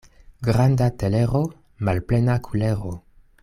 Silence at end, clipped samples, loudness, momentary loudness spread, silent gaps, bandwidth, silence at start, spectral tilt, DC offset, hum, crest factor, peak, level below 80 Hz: 0.45 s; under 0.1%; -22 LUFS; 10 LU; none; 13.5 kHz; 0.4 s; -8 dB/octave; under 0.1%; none; 14 dB; -8 dBFS; -42 dBFS